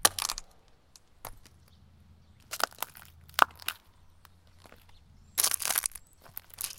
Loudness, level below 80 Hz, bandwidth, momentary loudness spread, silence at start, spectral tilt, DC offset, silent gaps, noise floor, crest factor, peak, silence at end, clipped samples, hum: -30 LUFS; -60 dBFS; 17 kHz; 22 LU; 0 s; 0.5 dB/octave; under 0.1%; none; -60 dBFS; 34 dB; 0 dBFS; 0.05 s; under 0.1%; none